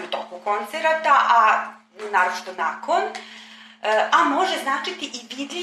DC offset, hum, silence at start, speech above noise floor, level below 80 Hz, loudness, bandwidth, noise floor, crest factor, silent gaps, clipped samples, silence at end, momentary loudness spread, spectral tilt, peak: under 0.1%; none; 0 s; 23 dB; -84 dBFS; -21 LUFS; 14 kHz; -44 dBFS; 18 dB; none; under 0.1%; 0 s; 15 LU; -1.5 dB/octave; -4 dBFS